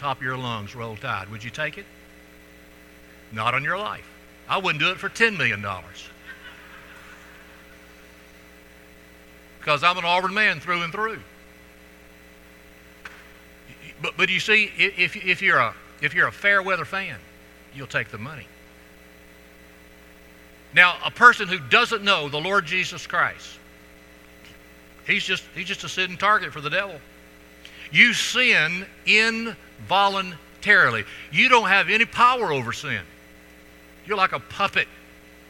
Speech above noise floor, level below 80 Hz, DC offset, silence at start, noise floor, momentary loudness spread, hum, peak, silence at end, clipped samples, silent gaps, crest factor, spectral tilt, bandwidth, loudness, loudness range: 26 dB; -56 dBFS; under 0.1%; 0 s; -49 dBFS; 20 LU; none; 0 dBFS; 0.5 s; under 0.1%; none; 24 dB; -3 dB/octave; 19 kHz; -20 LUFS; 12 LU